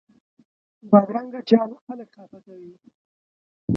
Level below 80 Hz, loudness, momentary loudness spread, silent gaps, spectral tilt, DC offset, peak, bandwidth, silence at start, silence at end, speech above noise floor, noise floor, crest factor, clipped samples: -60 dBFS; -20 LUFS; 21 LU; 1.81-1.87 s, 2.95-3.68 s; -9.5 dB/octave; under 0.1%; -2 dBFS; 6 kHz; 0.85 s; 0 s; over 68 dB; under -90 dBFS; 22 dB; under 0.1%